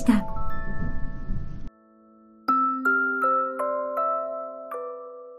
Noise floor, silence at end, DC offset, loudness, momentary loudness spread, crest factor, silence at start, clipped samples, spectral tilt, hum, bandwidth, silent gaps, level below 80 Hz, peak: -55 dBFS; 0 s; under 0.1%; -26 LUFS; 15 LU; 18 dB; 0 s; under 0.1%; -7 dB/octave; none; 14 kHz; none; -36 dBFS; -8 dBFS